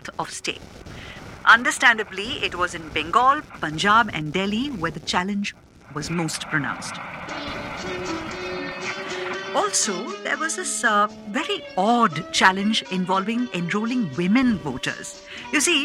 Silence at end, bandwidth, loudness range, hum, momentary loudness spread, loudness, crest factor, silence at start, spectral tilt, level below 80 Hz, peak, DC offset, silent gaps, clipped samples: 0 s; 16 kHz; 8 LU; none; 14 LU; -22 LUFS; 22 dB; 0.05 s; -3 dB/octave; -52 dBFS; -2 dBFS; under 0.1%; none; under 0.1%